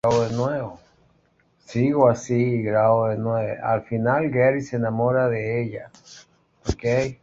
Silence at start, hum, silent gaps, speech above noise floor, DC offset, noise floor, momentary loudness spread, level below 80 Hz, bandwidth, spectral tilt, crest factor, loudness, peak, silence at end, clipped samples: 0.05 s; none; none; 41 dB; under 0.1%; -63 dBFS; 12 LU; -48 dBFS; 7.8 kHz; -7.5 dB/octave; 18 dB; -22 LUFS; -4 dBFS; 0.1 s; under 0.1%